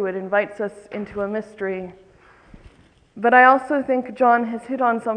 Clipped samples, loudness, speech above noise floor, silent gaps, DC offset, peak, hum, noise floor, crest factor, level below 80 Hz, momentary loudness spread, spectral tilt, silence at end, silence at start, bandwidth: under 0.1%; -20 LUFS; 32 dB; none; under 0.1%; 0 dBFS; none; -52 dBFS; 20 dB; -58 dBFS; 17 LU; -6.5 dB/octave; 0 s; 0 s; 9.6 kHz